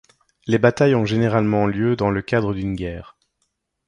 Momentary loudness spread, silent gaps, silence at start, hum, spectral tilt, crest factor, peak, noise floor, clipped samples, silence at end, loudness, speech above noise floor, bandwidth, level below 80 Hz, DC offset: 12 LU; none; 0.45 s; none; -7.5 dB/octave; 18 dB; -4 dBFS; -73 dBFS; under 0.1%; 0.85 s; -20 LUFS; 54 dB; 10 kHz; -44 dBFS; under 0.1%